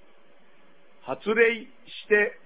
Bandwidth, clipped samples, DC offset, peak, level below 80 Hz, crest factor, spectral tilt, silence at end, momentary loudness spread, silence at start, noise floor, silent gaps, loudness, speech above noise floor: 4 kHz; under 0.1%; 0.4%; -6 dBFS; -66 dBFS; 20 dB; -7.5 dB/octave; 0.15 s; 20 LU; 1.05 s; -60 dBFS; none; -24 LUFS; 35 dB